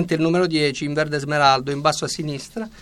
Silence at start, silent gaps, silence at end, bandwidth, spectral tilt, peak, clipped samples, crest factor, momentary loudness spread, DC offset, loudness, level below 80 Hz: 0 s; none; 0 s; 14 kHz; -4.5 dB/octave; -4 dBFS; under 0.1%; 18 dB; 11 LU; under 0.1%; -20 LUFS; -52 dBFS